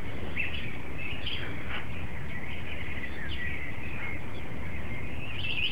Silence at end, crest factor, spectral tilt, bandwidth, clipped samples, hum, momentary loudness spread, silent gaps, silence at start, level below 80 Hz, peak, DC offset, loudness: 0 s; 16 dB; -5.5 dB/octave; 16 kHz; under 0.1%; none; 6 LU; none; 0 s; -44 dBFS; -16 dBFS; 4%; -36 LUFS